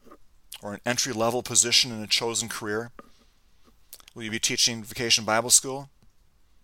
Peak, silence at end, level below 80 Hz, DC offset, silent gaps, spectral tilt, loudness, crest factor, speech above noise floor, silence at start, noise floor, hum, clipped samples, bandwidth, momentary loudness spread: -2 dBFS; 0.75 s; -60 dBFS; under 0.1%; none; -1 dB/octave; -23 LUFS; 24 dB; 33 dB; 0.05 s; -59 dBFS; none; under 0.1%; 17 kHz; 19 LU